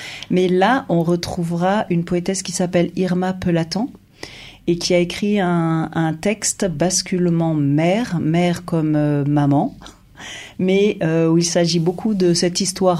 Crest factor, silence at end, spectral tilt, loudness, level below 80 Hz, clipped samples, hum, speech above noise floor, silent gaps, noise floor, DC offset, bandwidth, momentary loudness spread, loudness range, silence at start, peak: 14 dB; 0 s; -5 dB/octave; -18 LUFS; -48 dBFS; under 0.1%; none; 20 dB; none; -38 dBFS; under 0.1%; 14 kHz; 7 LU; 2 LU; 0 s; -4 dBFS